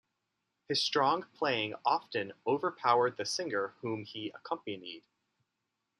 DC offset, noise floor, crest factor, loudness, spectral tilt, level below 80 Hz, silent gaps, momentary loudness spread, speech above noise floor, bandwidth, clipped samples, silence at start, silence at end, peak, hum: under 0.1%; -85 dBFS; 22 dB; -33 LUFS; -3.5 dB/octave; -84 dBFS; none; 13 LU; 52 dB; 12.5 kHz; under 0.1%; 0.7 s; 1 s; -14 dBFS; none